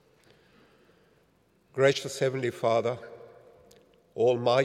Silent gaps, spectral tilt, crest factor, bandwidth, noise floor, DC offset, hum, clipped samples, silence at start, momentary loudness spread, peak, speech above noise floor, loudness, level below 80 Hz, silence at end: none; -5 dB/octave; 20 dB; 15 kHz; -66 dBFS; under 0.1%; none; under 0.1%; 1.75 s; 19 LU; -10 dBFS; 40 dB; -27 LUFS; -76 dBFS; 0 s